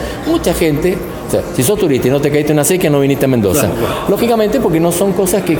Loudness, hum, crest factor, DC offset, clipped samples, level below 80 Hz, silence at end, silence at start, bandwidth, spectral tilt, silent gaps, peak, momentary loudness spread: -13 LUFS; none; 12 dB; under 0.1%; under 0.1%; -34 dBFS; 0 s; 0 s; 17.5 kHz; -5.5 dB/octave; none; 0 dBFS; 5 LU